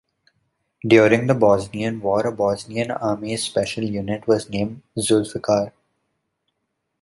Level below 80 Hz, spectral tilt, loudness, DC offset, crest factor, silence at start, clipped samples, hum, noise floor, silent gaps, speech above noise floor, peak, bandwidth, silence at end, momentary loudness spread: -54 dBFS; -5.5 dB/octave; -20 LUFS; under 0.1%; 20 dB; 0.85 s; under 0.1%; none; -76 dBFS; none; 56 dB; -2 dBFS; 11.5 kHz; 1.3 s; 10 LU